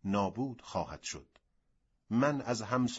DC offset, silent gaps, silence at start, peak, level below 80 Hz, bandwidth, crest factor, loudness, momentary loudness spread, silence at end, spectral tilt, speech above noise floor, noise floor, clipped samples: under 0.1%; none; 0.05 s; -16 dBFS; -64 dBFS; 8 kHz; 18 dB; -35 LUFS; 11 LU; 0 s; -5.5 dB/octave; 42 dB; -75 dBFS; under 0.1%